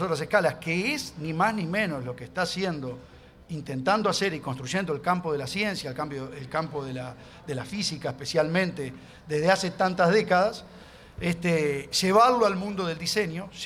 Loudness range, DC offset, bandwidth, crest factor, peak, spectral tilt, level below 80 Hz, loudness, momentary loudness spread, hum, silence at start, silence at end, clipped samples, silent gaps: 6 LU; under 0.1%; 15.5 kHz; 22 dB; -6 dBFS; -4.5 dB/octave; -56 dBFS; -26 LUFS; 14 LU; none; 0 s; 0 s; under 0.1%; none